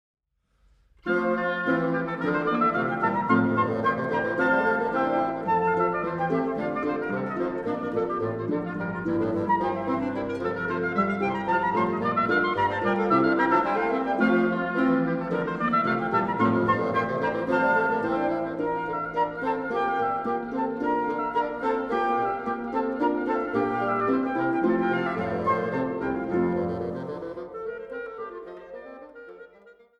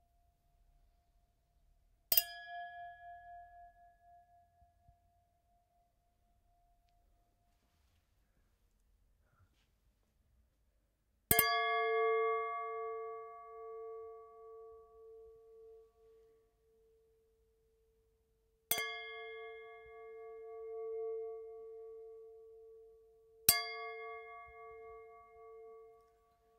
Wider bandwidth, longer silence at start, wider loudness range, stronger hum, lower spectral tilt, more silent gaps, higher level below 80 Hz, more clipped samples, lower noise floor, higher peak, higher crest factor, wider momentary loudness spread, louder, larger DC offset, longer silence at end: second, 7.8 kHz vs 14.5 kHz; second, 1.05 s vs 2.1 s; second, 5 LU vs 19 LU; neither; first, -8 dB/octave vs -1 dB/octave; neither; first, -58 dBFS vs -70 dBFS; neither; second, -66 dBFS vs -78 dBFS; about the same, -8 dBFS vs -8 dBFS; second, 16 dB vs 36 dB; second, 7 LU vs 27 LU; first, -26 LUFS vs -36 LUFS; neither; second, 0.3 s vs 0.6 s